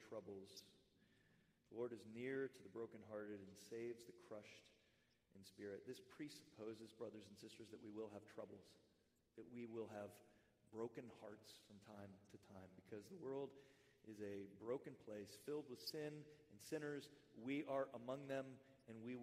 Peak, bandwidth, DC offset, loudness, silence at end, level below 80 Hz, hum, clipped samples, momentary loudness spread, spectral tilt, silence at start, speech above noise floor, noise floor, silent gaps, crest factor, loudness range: -34 dBFS; 15.5 kHz; under 0.1%; -54 LUFS; 0 s; under -90 dBFS; none; under 0.1%; 14 LU; -5.5 dB/octave; 0 s; 28 dB; -81 dBFS; none; 22 dB; 7 LU